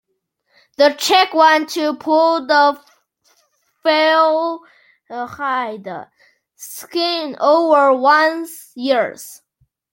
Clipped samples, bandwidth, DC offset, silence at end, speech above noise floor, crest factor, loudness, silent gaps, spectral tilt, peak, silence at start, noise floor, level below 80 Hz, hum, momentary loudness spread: under 0.1%; 17 kHz; under 0.1%; 0.6 s; 53 dB; 16 dB; -15 LUFS; none; -2 dB/octave; -2 dBFS; 0.8 s; -69 dBFS; -70 dBFS; none; 20 LU